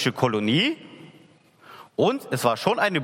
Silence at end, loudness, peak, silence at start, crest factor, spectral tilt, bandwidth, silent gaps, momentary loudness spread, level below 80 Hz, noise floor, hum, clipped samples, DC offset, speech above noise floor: 0 s; -23 LUFS; -6 dBFS; 0 s; 18 dB; -5 dB/octave; 16.5 kHz; none; 6 LU; -68 dBFS; -54 dBFS; none; under 0.1%; under 0.1%; 32 dB